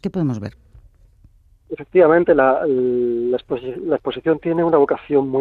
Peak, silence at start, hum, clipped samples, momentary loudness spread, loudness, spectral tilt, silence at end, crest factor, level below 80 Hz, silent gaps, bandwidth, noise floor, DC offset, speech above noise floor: -2 dBFS; 0.05 s; none; under 0.1%; 13 LU; -18 LUFS; -9 dB/octave; 0 s; 16 dB; -52 dBFS; none; 6.6 kHz; -51 dBFS; under 0.1%; 34 dB